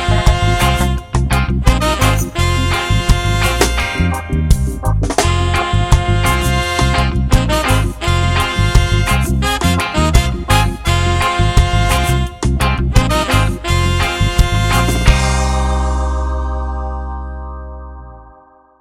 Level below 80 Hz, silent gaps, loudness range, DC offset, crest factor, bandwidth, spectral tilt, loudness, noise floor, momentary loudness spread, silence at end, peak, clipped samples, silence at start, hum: -18 dBFS; none; 2 LU; under 0.1%; 14 dB; 16.5 kHz; -5 dB/octave; -15 LUFS; -45 dBFS; 6 LU; 0.5 s; 0 dBFS; 0.1%; 0 s; none